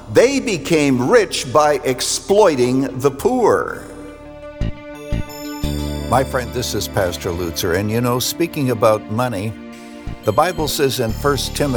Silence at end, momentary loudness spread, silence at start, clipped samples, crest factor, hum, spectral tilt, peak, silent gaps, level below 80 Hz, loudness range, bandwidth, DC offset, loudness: 0 s; 15 LU; 0 s; under 0.1%; 16 dB; none; -4.5 dB/octave; -2 dBFS; none; -34 dBFS; 6 LU; over 20 kHz; under 0.1%; -18 LUFS